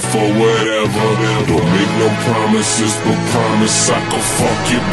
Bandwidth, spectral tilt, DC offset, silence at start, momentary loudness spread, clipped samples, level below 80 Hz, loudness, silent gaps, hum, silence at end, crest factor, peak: 12.5 kHz; -4 dB/octave; under 0.1%; 0 s; 3 LU; under 0.1%; -38 dBFS; -14 LUFS; none; none; 0 s; 14 dB; 0 dBFS